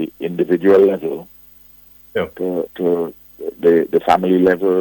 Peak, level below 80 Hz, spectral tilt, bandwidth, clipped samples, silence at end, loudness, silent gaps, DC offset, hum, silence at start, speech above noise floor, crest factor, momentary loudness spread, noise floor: -2 dBFS; -54 dBFS; -7.5 dB/octave; 17.5 kHz; under 0.1%; 0 s; -16 LUFS; none; under 0.1%; none; 0 s; 30 dB; 16 dB; 14 LU; -45 dBFS